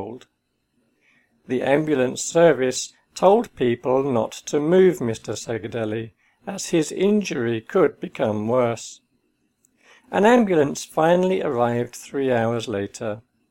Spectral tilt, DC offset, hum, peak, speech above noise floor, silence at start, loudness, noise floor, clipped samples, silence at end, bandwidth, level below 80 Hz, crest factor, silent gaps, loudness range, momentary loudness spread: -5.5 dB/octave; under 0.1%; none; -2 dBFS; 49 dB; 0 s; -21 LUFS; -70 dBFS; under 0.1%; 0.3 s; 17 kHz; -60 dBFS; 20 dB; none; 4 LU; 14 LU